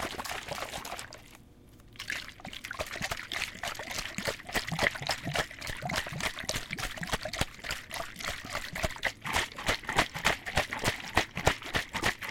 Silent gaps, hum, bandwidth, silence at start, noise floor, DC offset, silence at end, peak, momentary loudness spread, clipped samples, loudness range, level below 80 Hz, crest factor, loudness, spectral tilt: none; none; 17 kHz; 0 s; -55 dBFS; under 0.1%; 0 s; -8 dBFS; 9 LU; under 0.1%; 7 LU; -48 dBFS; 26 dB; -33 LUFS; -2.5 dB/octave